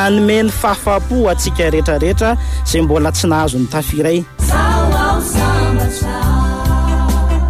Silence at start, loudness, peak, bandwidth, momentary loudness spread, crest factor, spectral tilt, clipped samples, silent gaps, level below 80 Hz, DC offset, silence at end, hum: 0 s; -14 LUFS; -2 dBFS; 15.5 kHz; 3 LU; 10 dB; -5.5 dB/octave; under 0.1%; none; -18 dBFS; under 0.1%; 0 s; none